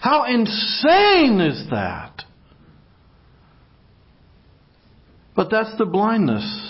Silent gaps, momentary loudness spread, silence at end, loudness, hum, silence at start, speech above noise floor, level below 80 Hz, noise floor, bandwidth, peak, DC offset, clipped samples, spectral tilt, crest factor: none; 14 LU; 0 s; -18 LUFS; none; 0 s; 35 dB; -52 dBFS; -53 dBFS; 5.8 kHz; -4 dBFS; under 0.1%; under 0.1%; -9 dB/octave; 18 dB